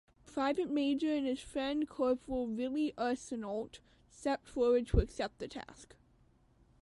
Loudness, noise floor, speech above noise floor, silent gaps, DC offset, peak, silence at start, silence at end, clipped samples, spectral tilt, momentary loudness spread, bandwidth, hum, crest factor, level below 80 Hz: -35 LUFS; -68 dBFS; 33 dB; none; under 0.1%; -16 dBFS; 0.25 s; 1 s; under 0.1%; -6.5 dB/octave; 12 LU; 11.5 kHz; none; 20 dB; -46 dBFS